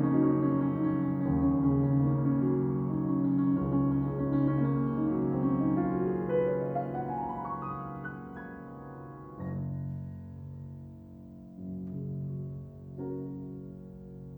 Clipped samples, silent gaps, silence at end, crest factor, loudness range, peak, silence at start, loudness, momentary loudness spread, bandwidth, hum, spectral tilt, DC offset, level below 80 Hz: under 0.1%; none; 0 s; 16 dB; 13 LU; -14 dBFS; 0 s; -30 LUFS; 18 LU; 3.2 kHz; none; -12.5 dB/octave; under 0.1%; -52 dBFS